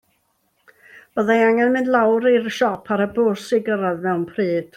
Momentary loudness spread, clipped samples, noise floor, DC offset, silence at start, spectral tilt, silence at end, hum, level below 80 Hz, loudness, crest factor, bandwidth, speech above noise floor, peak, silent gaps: 7 LU; under 0.1%; -66 dBFS; under 0.1%; 0.95 s; -6 dB/octave; 0.1 s; none; -64 dBFS; -19 LUFS; 16 dB; 14 kHz; 48 dB; -4 dBFS; none